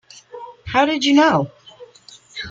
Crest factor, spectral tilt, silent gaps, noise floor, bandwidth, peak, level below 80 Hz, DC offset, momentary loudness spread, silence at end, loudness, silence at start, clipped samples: 18 dB; -4.5 dB/octave; none; -46 dBFS; 7.8 kHz; -2 dBFS; -52 dBFS; under 0.1%; 23 LU; 0 s; -16 LUFS; 0.35 s; under 0.1%